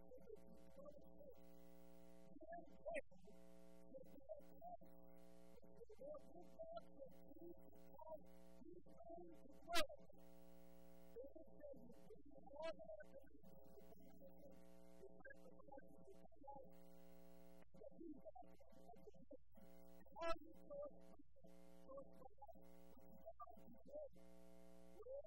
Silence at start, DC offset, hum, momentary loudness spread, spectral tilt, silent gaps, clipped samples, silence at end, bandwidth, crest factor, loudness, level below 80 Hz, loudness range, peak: 0 s; 0.1%; none; 14 LU; -4 dB/octave; none; under 0.1%; 0 s; 16 kHz; 30 dB; -60 LUFS; -72 dBFS; 11 LU; -26 dBFS